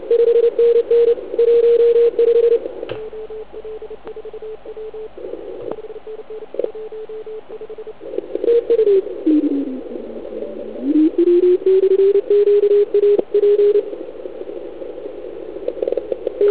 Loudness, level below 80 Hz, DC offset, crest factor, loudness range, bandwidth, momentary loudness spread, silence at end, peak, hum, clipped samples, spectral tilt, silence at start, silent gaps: -15 LUFS; -56 dBFS; 1%; 14 dB; 16 LU; 4 kHz; 19 LU; 0 s; -2 dBFS; none; under 0.1%; -10 dB/octave; 0 s; none